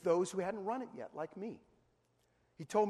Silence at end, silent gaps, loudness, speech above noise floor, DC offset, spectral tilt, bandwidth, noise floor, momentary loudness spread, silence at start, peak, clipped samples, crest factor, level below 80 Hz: 0 s; none; -40 LUFS; 39 dB; under 0.1%; -5.5 dB/octave; 13 kHz; -76 dBFS; 16 LU; 0.05 s; -20 dBFS; under 0.1%; 18 dB; -80 dBFS